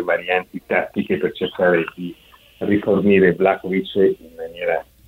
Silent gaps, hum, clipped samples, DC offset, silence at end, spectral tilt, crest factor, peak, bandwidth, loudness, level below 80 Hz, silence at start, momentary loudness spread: none; none; under 0.1%; under 0.1%; 0.25 s; -8 dB/octave; 18 dB; -2 dBFS; 15.5 kHz; -19 LUFS; -54 dBFS; 0 s; 13 LU